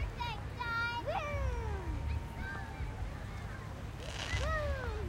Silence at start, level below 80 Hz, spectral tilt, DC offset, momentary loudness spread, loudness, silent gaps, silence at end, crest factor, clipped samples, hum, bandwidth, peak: 0 s; -42 dBFS; -5.5 dB/octave; under 0.1%; 9 LU; -39 LUFS; none; 0 s; 18 dB; under 0.1%; none; 15.5 kHz; -20 dBFS